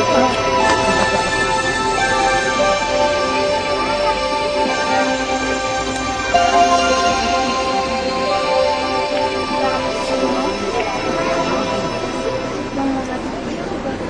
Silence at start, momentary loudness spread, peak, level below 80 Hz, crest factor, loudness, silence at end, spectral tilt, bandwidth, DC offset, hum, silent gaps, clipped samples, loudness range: 0 s; 7 LU; 0 dBFS; -38 dBFS; 18 dB; -17 LUFS; 0 s; -3.5 dB/octave; 10.5 kHz; under 0.1%; none; none; under 0.1%; 4 LU